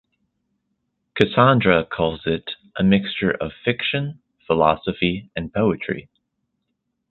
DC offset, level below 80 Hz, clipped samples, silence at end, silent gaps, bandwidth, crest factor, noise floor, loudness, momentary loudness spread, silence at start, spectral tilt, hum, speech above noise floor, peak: under 0.1%; -48 dBFS; under 0.1%; 1.1 s; none; 6 kHz; 22 dB; -76 dBFS; -20 LUFS; 13 LU; 1.15 s; -8.5 dB/octave; none; 56 dB; 0 dBFS